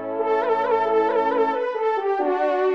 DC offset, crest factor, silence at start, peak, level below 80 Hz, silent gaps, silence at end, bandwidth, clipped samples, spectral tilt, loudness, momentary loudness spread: 0.1%; 12 dB; 0 s; -8 dBFS; -74 dBFS; none; 0 s; 6.2 kHz; under 0.1%; -5.5 dB/octave; -21 LUFS; 3 LU